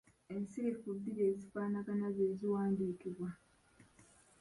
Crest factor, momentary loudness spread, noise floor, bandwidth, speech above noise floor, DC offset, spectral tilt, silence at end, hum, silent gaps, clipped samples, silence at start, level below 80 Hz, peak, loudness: 14 dB; 10 LU; -67 dBFS; 11.5 kHz; 29 dB; under 0.1%; -9 dB/octave; 0.4 s; none; none; under 0.1%; 0.3 s; -74 dBFS; -24 dBFS; -39 LUFS